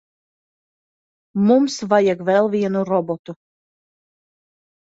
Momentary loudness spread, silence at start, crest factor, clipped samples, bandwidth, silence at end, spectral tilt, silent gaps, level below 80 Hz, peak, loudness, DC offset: 13 LU; 1.35 s; 18 dB; under 0.1%; 8 kHz; 1.5 s; -6.5 dB/octave; 3.19-3.24 s; -66 dBFS; -4 dBFS; -18 LUFS; under 0.1%